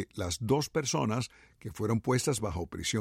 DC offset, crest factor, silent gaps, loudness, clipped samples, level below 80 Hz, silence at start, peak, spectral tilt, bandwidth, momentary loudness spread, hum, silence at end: under 0.1%; 16 dB; none; -31 LUFS; under 0.1%; -52 dBFS; 0 s; -16 dBFS; -4.5 dB/octave; 16 kHz; 9 LU; none; 0 s